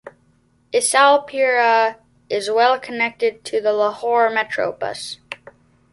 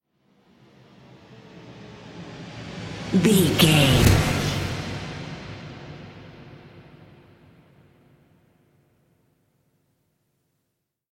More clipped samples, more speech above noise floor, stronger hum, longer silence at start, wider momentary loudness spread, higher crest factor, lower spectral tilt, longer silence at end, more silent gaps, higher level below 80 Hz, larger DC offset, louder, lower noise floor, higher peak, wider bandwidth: neither; second, 41 dB vs 62 dB; neither; second, 0.05 s vs 1.55 s; second, 13 LU vs 28 LU; about the same, 18 dB vs 22 dB; second, -1.5 dB/octave vs -5 dB/octave; second, 0.55 s vs 4.3 s; neither; second, -66 dBFS vs -40 dBFS; neither; about the same, -18 LUFS vs -20 LUFS; second, -59 dBFS vs -78 dBFS; about the same, -2 dBFS vs -4 dBFS; second, 11.5 kHz vs 16.5 kHz